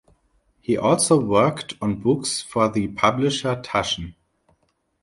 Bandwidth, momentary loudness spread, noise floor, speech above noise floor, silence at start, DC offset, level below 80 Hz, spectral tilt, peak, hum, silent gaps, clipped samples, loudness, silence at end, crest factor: 11.5 kHz; 10 LU; -67 dBFS; 46 dB; 0.7 s; under 0.1%; -50 dBFS; -4.5 dB/octave; -4 dBFS; none; none; under 0.1%; -21 LUFS; 0.9 s; 20 dB